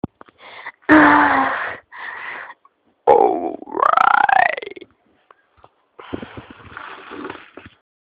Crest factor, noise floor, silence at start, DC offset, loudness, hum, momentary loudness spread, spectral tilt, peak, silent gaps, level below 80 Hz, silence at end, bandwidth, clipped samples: 20 dB; -59 dBFS; 0.05 s; under 0.1%; -15 LUFS; none; 24 LU; -7 dB/octave; 0 dBFS; none; -54 dBFS; 0.85 s; 5 kHz; under 0.1%